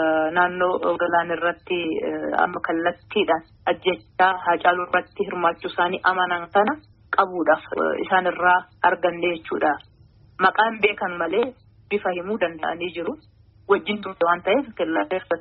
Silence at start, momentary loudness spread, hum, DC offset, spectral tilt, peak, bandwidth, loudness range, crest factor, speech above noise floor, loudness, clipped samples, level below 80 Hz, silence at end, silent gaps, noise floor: 0 s; 7 LU; none; under 0.1%; -2 dB/octave; -4 dBFS; 5 kHz; 3 LU; 18 dB; 30 dB; -22 LUFS; under 0.1%; -60 dBFS; 0 s; none; -52 dBFS